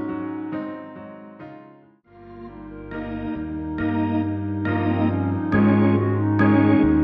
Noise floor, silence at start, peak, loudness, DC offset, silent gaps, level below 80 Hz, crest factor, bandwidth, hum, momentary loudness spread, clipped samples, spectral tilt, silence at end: -50 dBFS; 0 s; -6 dBFS; -22 LUFS; under 0.1%; none; -44 dBFS; 16 dB; 5 kHz; none; 23 LU; under 0.1%; -11 dB/octave; 0 s